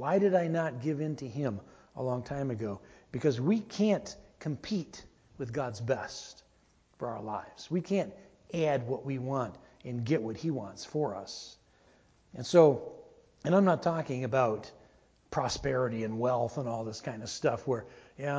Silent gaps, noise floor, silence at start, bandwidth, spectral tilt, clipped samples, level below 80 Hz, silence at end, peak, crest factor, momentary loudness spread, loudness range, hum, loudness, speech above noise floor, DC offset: none; -67 dBFS; 0 s; 8 kHz; -6.5 dB/octave; under 0.1%; -62 dBFS; 0 s; -8 dBFS; 24 dB; 16 LU; 8 LU; none; -32 LUFS; 36 dB; under 0.1%